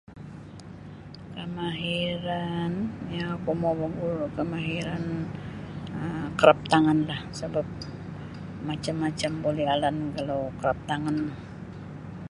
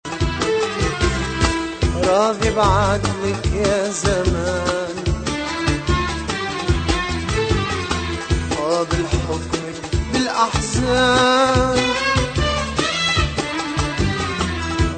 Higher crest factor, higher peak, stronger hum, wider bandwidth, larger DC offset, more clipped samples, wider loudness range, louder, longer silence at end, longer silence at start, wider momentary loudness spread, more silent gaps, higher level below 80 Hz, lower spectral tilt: first, 26 dB vs 18 dB; about the same, -2 dBFS vs -2 dBFS; neither; first, 11.5 kHz vs 9.2 kHz; neither; neither; about the same, 5 LU vs 4 LU; second, -28 LUFS vs -19 LUFS; about the same, 0 s vs 0 s; about the same, 0.1 s vs 0.05 s; first, 19 LU vs 7 LU; neither; second, -52 dBFS vs -28 dBFS; first, -6.5 dB/octave vs -4.5 dB/octave